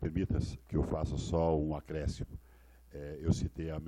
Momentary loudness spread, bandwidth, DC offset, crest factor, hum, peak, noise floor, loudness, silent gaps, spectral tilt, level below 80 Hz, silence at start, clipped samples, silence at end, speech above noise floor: 15 LU; 12 kHz; under 0.1%; 20 dB; none; -16 dBFS; -59 dBFS; -35 LUFS; none; -7.5 dB/octave; -44 dBFS; 0 s; under 0.1%; 0 s; 25 dB